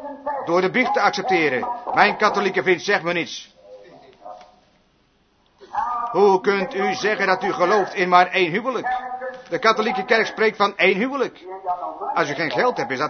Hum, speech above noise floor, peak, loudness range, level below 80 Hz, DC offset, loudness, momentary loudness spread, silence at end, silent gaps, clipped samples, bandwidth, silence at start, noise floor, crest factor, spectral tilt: none; 41 dB; 0 dBFS; 6 LU; -64 dBFS; under 0.1%; -20 LUFS; 11 LU; 0 s; none; under 0.1%; 6.6 kHz; 0 s; -61 dBFS; 22 dB; -4.5 dB/octave